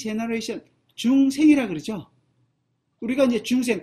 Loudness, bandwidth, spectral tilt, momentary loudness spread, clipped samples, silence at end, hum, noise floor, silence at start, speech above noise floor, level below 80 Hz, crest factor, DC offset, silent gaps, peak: -22 LUFS; 14 kHz; -5 dB/octave; 16 LU; under 0.1%; 0 s; none; -72 dBFS; 0 s; 51 dB; -62 dBFS; 16 dB; under 0.1%; none; -6 dBFS